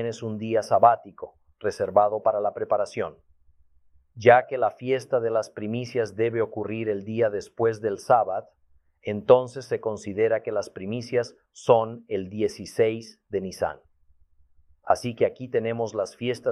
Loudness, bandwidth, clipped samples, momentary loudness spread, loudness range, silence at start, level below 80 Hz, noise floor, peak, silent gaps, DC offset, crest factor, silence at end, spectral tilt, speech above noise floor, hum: -25 LUFS; 12.5 kHz; under 0.1%; 12 LU; 4 LU; 0 s; -64 dBFS; -60 dBFS; -2 dBFS; none; under 0.1%; 24 dB; 0 s; -6 dB/octave; 35 dB; none